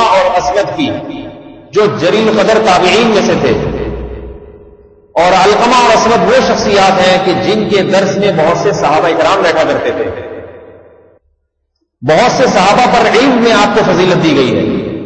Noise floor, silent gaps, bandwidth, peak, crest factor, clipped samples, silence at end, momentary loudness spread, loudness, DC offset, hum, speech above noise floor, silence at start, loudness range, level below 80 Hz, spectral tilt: -65 dBFS; none; 8.8 kHz; 0 dBFS; 10 dB; under 0.1%; 0 s; 12 LU; -9 LUFS; under 0.1%; none; 56 dB; 0 s; 5 LU; -36 dBFS; -4.5 dB/octave